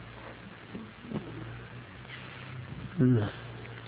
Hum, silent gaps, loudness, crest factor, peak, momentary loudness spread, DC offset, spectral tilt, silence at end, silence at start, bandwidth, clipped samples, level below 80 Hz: none; none; -34 LUFS; 20 dB; -14 dBFS; 19 LU; under 0.1%; -11 dB/octave; 0 s; 0 s; 4.8 kHz; under 0.1%; -56 dBFS